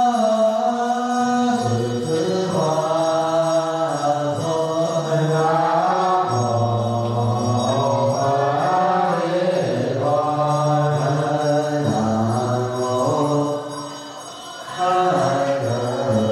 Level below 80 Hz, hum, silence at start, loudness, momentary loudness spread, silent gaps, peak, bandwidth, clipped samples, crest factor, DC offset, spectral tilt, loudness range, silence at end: -58 dBFS; none; 0 s; -20 LUFS; 4 LU; none; -8 dBFS; 13.5 kHz; under 0.1%; 12 dB; under 0.1%; -6 dB/octave; 2 LU; 0 s